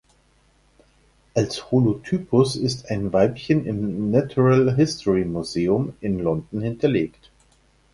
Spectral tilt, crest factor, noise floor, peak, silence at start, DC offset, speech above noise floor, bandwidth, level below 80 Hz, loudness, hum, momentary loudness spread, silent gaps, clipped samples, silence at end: -7 dB/octave; 18 dB; -60 dBFS; -4 dBFS; 1.35 s; under 0.1%; 39 dB; 11.5 kHz; -48 dBFS; -22 LUFS; none; 8 LU; none; under 0.1%; 0.85 s